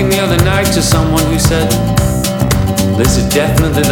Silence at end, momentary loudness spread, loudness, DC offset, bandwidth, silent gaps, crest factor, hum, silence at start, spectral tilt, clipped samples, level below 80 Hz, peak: 0 s; 2 LU; -12 LUFS; under 0.1%; over 20 kHz; none; 12 dB; none; 0 s; -5 dB/octave; under 0.1%; -22 dBFS; 0 dBFS